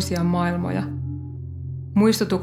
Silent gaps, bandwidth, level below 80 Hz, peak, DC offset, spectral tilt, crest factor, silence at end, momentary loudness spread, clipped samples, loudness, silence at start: none; 16 kHz; -52 dBFS; -6 dBFS; under 0.1%; -6 dB/octave; 16 dB; 0 s; 14 LU; under 0.1%; -23 LUFS; 0 s